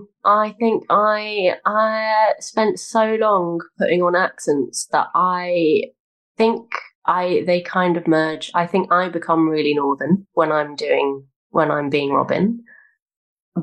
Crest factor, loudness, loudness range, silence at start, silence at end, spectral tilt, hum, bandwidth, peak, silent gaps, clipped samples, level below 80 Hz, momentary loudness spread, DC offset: 14 dB; -19 LUFS; 2 LU; 0 s; 0 s; -5 dB/octave; none; 12.5 kHz; -4 dBFS; 6.00-6.35 s, 6.95-7.02 s, 11.36-11.50 s, 13.02-13.06 s, 13.16-13.36 s, 13.42-13.52 s; under 0.1%; -68 dBFS; 5 LU; under 0.1%